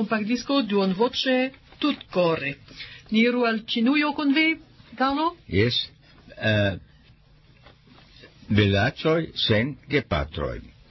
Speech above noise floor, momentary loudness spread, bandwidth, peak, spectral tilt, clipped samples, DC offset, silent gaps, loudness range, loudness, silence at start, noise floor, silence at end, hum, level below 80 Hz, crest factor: 31 dB; 11 LU; 6.2 kHz; -6 dBFS; -6.5 dB/octave; under 0.1%; under 0.1%; none; 4 LU; -24 LUFS; 0 s; -55 dBFS; 0.25 s; none; -46 dBFS; 18 dB